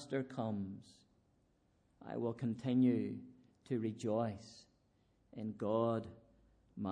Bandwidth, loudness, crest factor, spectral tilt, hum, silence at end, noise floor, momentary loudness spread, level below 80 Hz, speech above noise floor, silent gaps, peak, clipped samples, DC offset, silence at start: 9.8 kHz; -39 LUFS; 18 dB; -8 dB/octave; none; 0 s; -75 dBFS; 21 LU; -76 dBFS; 37 dB; none; -22 dBFS; under 0.1%; under 0.1%; 0 s